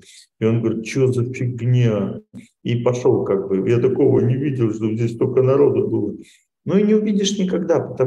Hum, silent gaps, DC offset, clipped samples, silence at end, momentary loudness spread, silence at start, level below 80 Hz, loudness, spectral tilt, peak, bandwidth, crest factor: none; none; under 0.1%; under 0.1%; 0 s; 8 LU; 0.4 s; -58 dBFS; -19 LUFS; -7 dB/octave; -4 dBFS; 11 kHz; 14 dB